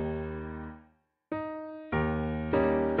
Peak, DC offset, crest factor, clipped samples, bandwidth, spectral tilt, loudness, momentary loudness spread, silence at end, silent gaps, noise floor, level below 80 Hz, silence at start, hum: -14 dBFS; under 0.1%; 18 dB; under 0.1%; 4.8 kHz; -7 dB/octave; -32 LUFS; 14 LU; 0 s; none; -65 dBFS; -46 dBFS; 0 s; none